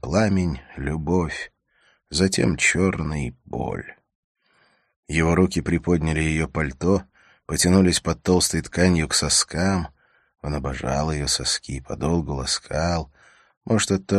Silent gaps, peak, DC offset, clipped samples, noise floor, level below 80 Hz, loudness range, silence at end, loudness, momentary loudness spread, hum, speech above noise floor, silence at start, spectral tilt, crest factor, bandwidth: 4.15-4.35 s, 4.96-5.03 s, 13.57-13.61 s; -2 dBFS; under 0.1%; under 0.1%; -63 dBFS; -38 dBFS; 4 LU; 0 s; -22 LUFS; 12 LU; none; 41 dB; 0.05 s; -4.5 dB/octave; 20 dB; 13 kHz